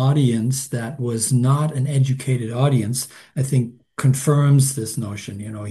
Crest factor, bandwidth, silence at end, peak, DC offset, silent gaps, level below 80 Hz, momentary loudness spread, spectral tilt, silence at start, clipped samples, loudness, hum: 14 dB; 12.5 kHz; 0 s; -4 dBFS; under 0.1%; none; -58 dBFS; 12 LU; -6 dB/octave; 0 s; under 0.1%; -20 LUFS; none